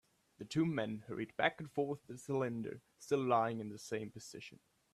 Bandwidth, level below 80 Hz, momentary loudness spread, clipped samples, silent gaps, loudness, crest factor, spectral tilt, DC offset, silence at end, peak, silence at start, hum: 14 kHz; -76 dBFS; 16 LU; under 0.1%; none; -39 LUFS; 22 dB; -6 dB/octave; under 0.1%; 0.4 s; -16 dBFS; 0.4 s; none